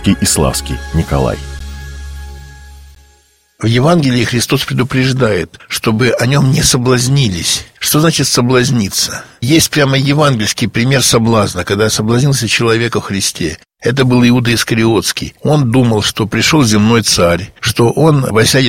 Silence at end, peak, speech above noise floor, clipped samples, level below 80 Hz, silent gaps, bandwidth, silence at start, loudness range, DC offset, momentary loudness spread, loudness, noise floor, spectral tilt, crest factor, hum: 0 s; 0 dBFS; 39 dB; under 0.1%; -32 dBFS; none; 16.5 kHz; 0 s; 5 LU; 0.3%; 9 LU; -12 LUFS; -51 dBFS; -4.5 dB/octave; 12 dB; none